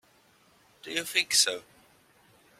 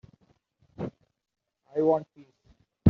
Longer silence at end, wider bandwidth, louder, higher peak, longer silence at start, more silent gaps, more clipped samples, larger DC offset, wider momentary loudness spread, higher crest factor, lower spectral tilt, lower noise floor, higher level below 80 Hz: first, 1 s vs 0 s; first, 16.5 kHz vs 6.2 kHz; first, -25 LUFS vs -30 LUFS; about the same, -8 dBFS vs -6 dBFS; about the same, 0.85 s vs 0.8 s; neither; neither; neither; first, 17 LU vs 14 LU; about the same, 24 dB vs 26 dB; second, 1 dB/octave vs -11 dB/octave; second, -63 dBFS vs -67 dBFS; second, -76 dBFS vs -68 dBFS